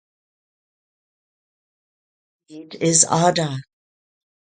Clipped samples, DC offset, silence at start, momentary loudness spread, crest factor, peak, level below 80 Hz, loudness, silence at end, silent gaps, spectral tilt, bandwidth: under 0.1%; under 0.1%; 2.5 s; 18 LU; 24 dB; 0 dBFS; -66 dBFS; -17 LUFS; 0.95 s; none; -3.5 dB/octave; 9.6 kHz